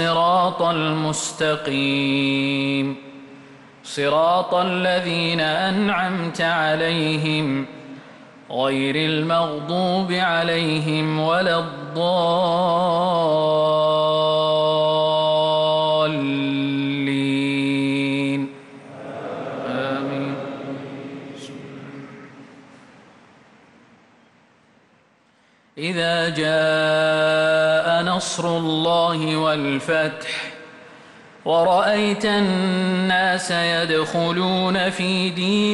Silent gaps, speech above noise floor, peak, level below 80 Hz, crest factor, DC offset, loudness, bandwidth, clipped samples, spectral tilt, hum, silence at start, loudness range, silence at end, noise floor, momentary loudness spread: none; 38 dB; -8 dBFS; -62 dBFS; 12 dB; under 0.1%; -20 LUFS; 11.5 kHz; under 0.1%; -5 dB/octave; none; 0 s; 10 LU; 0 s; -58 dBFS; 14 LU